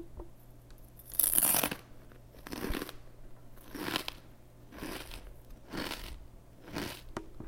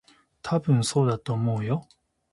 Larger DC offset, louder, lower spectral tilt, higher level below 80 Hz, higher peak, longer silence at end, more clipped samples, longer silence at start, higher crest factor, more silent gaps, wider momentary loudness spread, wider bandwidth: neither; second, -33 LUFS vs -26 LUFS; second, -2 dB/octave vs -6.5 dB/octave; first, -50 dBFS vs -60 dBFS; first, -2 dBFS vs -10 dBFS; second, 0 s vs 0.5 s; neither; second, 0 s vs 0.45 s; first, 36 dB vs 16 dB; neither; first, 28 LU vs 8 LU; first, 17 kHz vs 11.5 kHz